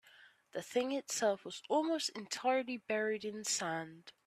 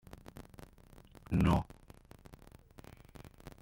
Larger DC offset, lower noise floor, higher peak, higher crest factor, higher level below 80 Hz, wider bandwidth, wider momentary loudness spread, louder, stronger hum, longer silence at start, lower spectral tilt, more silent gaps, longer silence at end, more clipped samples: neither; first, -63 dBFS vs -59 dBFS; second, -20 dBFS vs -16 dBFS; second, 18 dB vs 24 dB; second, -84 dBFS vs -50 dBFS; about the same, 15.5 kHz vs 16.5 kHz; second, 8 LU vs 27 LU; second, -36 LUFS vs -32 LUFS; neither; second, 0.2 s vs 1.3 s; second, -2.5 dB/octave vs -7.5 dB/octave; neither; second, 0.15 s vs 2 s; neither